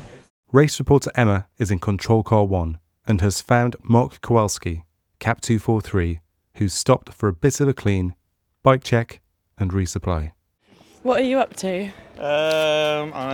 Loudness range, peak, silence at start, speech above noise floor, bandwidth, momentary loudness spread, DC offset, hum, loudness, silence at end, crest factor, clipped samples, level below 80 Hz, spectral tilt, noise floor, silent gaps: 4 LU; 0 dBFS; 0 s; 36 dB; 17.5 kHz; 10 LU; under 0.1%; none; -21 LUFS; 0 s; 20 dB; under 0.1%; -40 dBFS; -6 dB/octave; -55 dBFS; 0.30-0.43 s